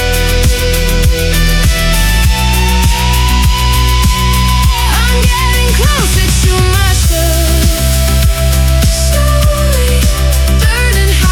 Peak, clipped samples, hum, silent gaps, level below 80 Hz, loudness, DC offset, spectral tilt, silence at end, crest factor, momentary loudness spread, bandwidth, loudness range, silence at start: 0 dBFS; under 0.1%; none; none; -10 dBFS; -10 LUFS; under 0.1%; -4 dB/octave; 0 s; 8 dB; 1 LU; 19 kHz; 1 LU; 0 s